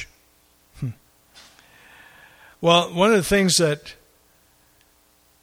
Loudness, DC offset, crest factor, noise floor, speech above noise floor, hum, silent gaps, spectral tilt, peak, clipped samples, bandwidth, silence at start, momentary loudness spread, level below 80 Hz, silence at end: -20 LUFS; under 0.1%; 22 dB; -59 dBFS; 41 dB; none; none; -4 dB/octave; -4 dBFS; under 0.1%; 16.5 kHz; 0 s; 17 LU; -50 dBFS; 1.5 s